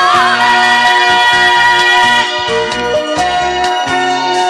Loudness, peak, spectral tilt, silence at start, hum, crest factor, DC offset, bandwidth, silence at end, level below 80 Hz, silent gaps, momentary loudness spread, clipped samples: -9 LUFS; 0 dBFS; -2 dB/octave; 0 s; none; 10 dB; under 0.1%; 13.5 kHz; 0 s; -42 dBFS; none; 7 LU; under 0.1%